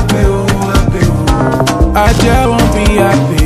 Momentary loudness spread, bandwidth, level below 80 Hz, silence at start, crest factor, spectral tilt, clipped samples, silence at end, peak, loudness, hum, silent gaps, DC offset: 2 LU; 15 kHz; -16 dBFS; 0 s; 10 dB; -6 dB/octave; under 0.1%; 0 s; 0 dBFS; -10 LUFS; none; none; under 0.1%